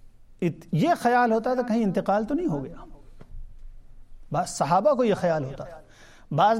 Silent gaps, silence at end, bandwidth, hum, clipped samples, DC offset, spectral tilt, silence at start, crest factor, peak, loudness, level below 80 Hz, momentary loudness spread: none; 0 s; 16 kHz; none; under 0.1%; under 0.1%; -6.5 dB/octave; 0.05 s; 16 dB; -8 dBFS; -25 LUFS; -48 dBFS; 11 LU